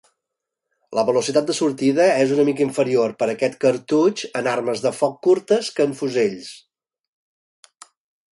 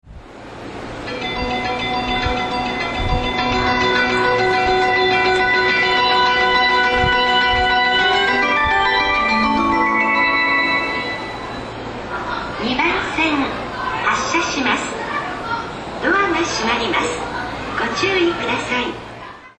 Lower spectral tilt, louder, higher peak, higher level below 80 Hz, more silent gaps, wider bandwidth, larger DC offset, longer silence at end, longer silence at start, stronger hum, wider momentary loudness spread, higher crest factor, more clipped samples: first, -5 dB/octave vs -3.5 dB/octave; second, -20 LUFS vs -17 LUFS; about the same, -4 dBFS vs -2 dBFS; second, -68 dBFS vs -36 dBFS; neither; first, 11.5 kHz vs 10 kHz; neither; first, 1.75 s vs 0.1 s; first, 0.9 s vs 0.05 s; neither; second, 6 LU vs 12 LU; about the same, 16 dB vs 16 dB; neither